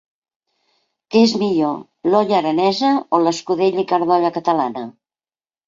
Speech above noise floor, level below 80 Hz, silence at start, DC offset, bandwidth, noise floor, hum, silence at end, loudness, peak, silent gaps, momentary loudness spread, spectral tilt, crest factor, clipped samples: over 73 dB; -64 dBFS; 1.1 s; under 0.1%; 7.6 kHz; under -90 dBFS; none; 0.75 s; -17 LUFS; -2 dBFS; none; 7 LU; -5.5 dB/octave; 16 dB; under 0.1%